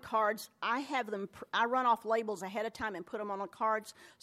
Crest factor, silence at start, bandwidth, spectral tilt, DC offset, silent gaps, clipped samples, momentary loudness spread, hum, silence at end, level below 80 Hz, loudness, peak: 18 dB; 0.05 s; 16 kHz; -4 dB/octave; under 0.1%; none; under 0.1%; 10 LU; none; 0.15 s; -74 dBFS; -35 LUFS; -18 dBFS